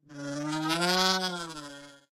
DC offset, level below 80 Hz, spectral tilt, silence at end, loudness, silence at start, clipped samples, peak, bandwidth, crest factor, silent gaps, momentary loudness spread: under 0.1%; -64 dBFS; -3 dB/octave; 0.15 s; -28 LUFS; 0.1 s; under 0.1%; -10 dBFS; 16 kHz; 22 dB; none; 19 LU